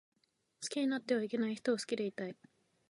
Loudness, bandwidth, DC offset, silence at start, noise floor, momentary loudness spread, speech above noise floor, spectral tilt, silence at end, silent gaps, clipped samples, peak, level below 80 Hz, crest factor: -37 LUFS; 11.5 kHz; under 0.1%; 0.6 s; -76 dBFS; 11 LU; 40 dB; -4 dB/octave; 0.55 s; none; under 0.1%; -20 dBFS; -88 dBFS; 18 dB